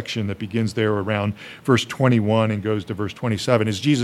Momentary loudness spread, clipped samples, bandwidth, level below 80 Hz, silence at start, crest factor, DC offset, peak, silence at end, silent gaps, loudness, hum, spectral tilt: 8 LU; under 0.1%; 13 kHz; -60 dBFS; 0 s; 18 dB; under 0.1%; -2 dBFS; 0 s; none; -22 LUFS; none; -6 dB/octave